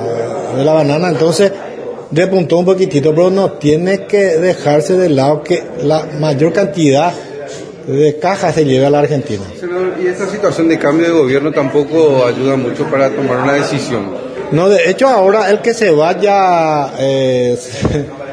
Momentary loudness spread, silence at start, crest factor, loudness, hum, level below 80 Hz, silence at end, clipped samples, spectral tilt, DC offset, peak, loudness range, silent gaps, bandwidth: 8 LU; 0 s; 12 dB; -12 LUFS; none; -44 dBFS; 0 s; under 0.1%; -6 dB/octave; under 0.1%; 0 dBFS; 2 LU; none; 11 kHz